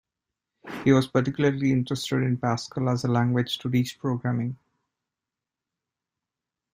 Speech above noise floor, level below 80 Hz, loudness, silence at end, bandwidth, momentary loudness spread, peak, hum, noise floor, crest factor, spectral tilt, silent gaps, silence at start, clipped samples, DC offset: 64 dB; -60 dBFS; -25 LUFS; 2.2 s; 15.5 kHz; 7 LU; -6 dBFS; none; -88 dBFS; 20 dB; -6.5 dB/octave; none; 0.65 s; under 0.1%; under 0.1%